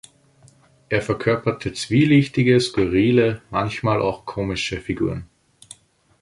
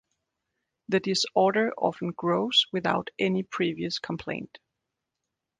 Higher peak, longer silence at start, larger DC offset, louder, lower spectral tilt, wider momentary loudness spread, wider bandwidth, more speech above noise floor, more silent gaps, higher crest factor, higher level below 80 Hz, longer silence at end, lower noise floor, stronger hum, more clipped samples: first, -4 dBFS vs -10 dBFS; about the same, 0.9 s vs 0.9 s; neither; first, -20 LUFS vs -26 LUFS; first, -6.5 dB/octave vs -4.5 dB/octave; about the same, 9 LU vs 11 LU; first, 11.5 kHz vs 9.8 kHz; second, 34 dB vs 58 dB; neither; about the same, 18 dB vs 20 dB; first, -46 dBFS vs -66 dBFS; second, 1 s vs 1.15 s; second, -54 dBFS vs -85 dBFS; neither; neither